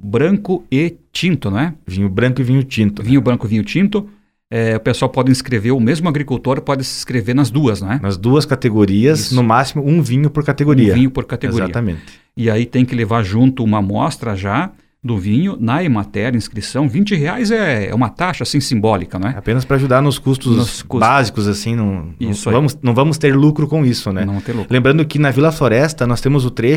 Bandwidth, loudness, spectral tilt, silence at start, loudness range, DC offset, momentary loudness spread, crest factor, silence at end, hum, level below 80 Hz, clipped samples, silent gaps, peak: 15.5 kHz; -15 LUFS; -6.5 dB/octave; 0 s; 3 LU; under 0.1%; 7 LU; 14 dB; 0 s; none; -40 dBFS; under 0.1%; none; 0 dBFS